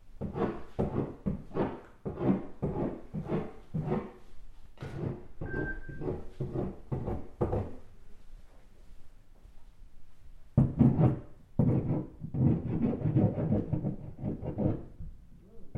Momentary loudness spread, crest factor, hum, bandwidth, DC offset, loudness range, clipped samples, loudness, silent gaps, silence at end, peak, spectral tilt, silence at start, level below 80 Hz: 12 LU; 22 dB; none; 4.9 kHz; under 0.1%; 10 LU; under 0.1%; -33 LUFS; none; 0 s; -10 dBFS; -10.5 dB/octave; 0 s; -46 dBFS